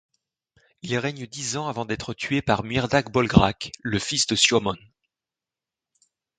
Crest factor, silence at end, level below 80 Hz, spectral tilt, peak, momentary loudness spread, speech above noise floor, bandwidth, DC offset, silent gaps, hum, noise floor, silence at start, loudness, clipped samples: 24 dB; 1.6 s; -46 dBFS; -4 dB/octave; 0 dBFS; 12 LU; 66 dB; 9.6 kHz; under 0.1%; none; none; -89 dBFS; 0.85 s; -23 LUFS; under 0.1%